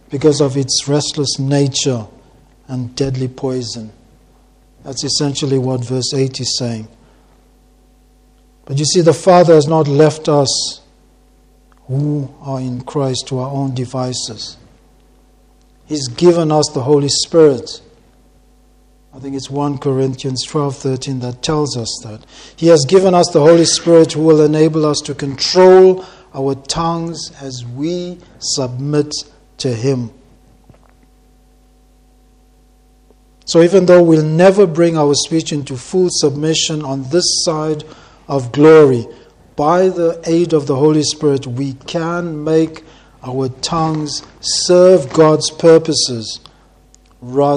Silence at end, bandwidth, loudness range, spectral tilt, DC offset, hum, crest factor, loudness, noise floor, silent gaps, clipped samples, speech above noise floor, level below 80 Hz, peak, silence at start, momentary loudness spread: 0 s; 11 kHz; 10 LU; -5 dB/octave; under 0.1%; none; 14 dB; -14 LUFS; -49 dBFS; none; 0.1%; 36 dB; -48 dBFS; 0 dBFS; 0.1 s; 15 LU